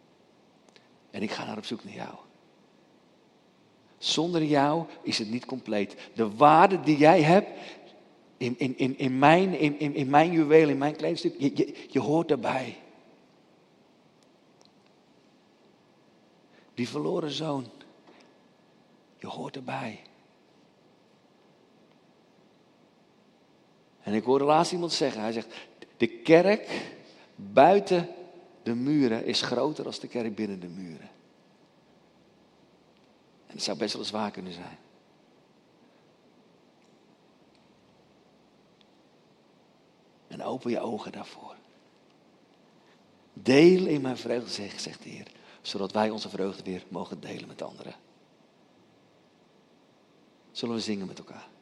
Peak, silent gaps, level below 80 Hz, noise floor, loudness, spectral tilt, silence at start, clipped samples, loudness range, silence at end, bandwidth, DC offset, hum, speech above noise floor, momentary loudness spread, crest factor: -4 dBFS; none; -76 dBFS; -61 dBFS; -26 LUFS; -5.5 dB/octave; 1.15 s; under 0.1%; 19 LU; 0.15 s; 11.5 kHz; under 0.1%; none; 35 dB; 23 LU; 26 dB